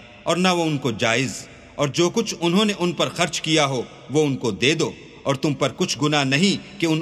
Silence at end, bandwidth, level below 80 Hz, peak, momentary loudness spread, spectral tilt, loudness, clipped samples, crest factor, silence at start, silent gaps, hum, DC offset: 0 s; 14 kHz; -58 dBFS; -2 dBFS; 7 LU; -4.5 dB/octave; -21 LUFS; under 0.1%; 18 dB; 0 s; none; none; under 0.1%